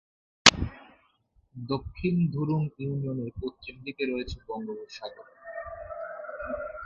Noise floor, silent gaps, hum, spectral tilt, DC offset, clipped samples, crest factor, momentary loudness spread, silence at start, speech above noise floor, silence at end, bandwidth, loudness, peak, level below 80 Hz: -67 dBFS; none; none; -3.5 dB/octave; under 0.1%; under 0.1%; 30 dB; 21 LU; 0.45 s; 35 dB; 0 s; 11.5 kHz; -28 LUFS; 0 dBFS; -48 dBFS